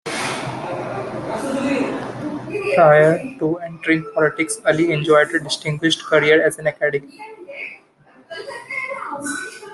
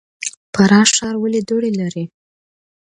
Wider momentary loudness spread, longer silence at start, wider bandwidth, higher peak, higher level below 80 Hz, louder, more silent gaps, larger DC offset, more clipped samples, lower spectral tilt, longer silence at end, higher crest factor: about the same, 18 LU vs 16 LU; second, 0.05 s vs 0.2 s; first, 12.5 kHz vs 11 kHz; about the same, -2 dBFS vs 0 dBFS; about the same, -58 dBFS vs -54 dBFS; second, -19 LUFS vs -15 LUFS; second, none vs 0.37-0.53 s; neither; neither; about the same, -4.5 dB/octave vs -4 dB/octave; second, 0 s vs 0.8 s; about the same, 18 dB vs 18 dB